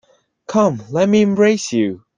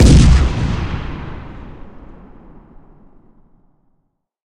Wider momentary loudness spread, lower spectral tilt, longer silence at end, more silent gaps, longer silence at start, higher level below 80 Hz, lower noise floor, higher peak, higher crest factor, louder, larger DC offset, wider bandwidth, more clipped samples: second, 6 LU vs 27 LU; about the same, -6 dB/octave vs -6 dB/octave; second, 0.2 s vs 2.55 s; neither; first, 0.5 s vs 0 s; second, -58 dBFS vs -18 dBFS; second, -37 dBFS vs -65 dBFS; about the same, -2 dBFS vs 0 dBFS; about the same, 14 dB vs 16 dB; about the same, -16 LUFS vs -15 LUFS; neither; second, 9.4 kHz vs 10.5 kHz; neither